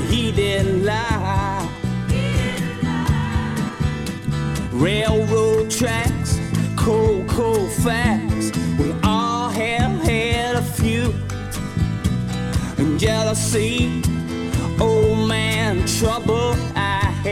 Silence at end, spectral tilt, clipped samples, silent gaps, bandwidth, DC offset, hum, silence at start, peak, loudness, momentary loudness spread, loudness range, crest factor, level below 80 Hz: 0 s; -5.5 dB/octave; under 0.1%; none; 17 kHz; under 0.1%; none; 0 s; -4 dBFS; -20 LUFS; 6 LU; 2 LU; 16 dB; -32 dBFS